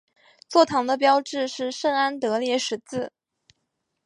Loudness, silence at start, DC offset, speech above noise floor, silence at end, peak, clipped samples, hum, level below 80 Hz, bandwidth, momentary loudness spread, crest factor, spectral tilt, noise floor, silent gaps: -23 LUFS; 0.5 s; under 0.1%; 55 dB; 1 s; -4 dBFS; under 0.1%; none; -72 dBFS; 11 kHz; 11 LU; 22 dB; -3 dB/octave; -77 dBFS; none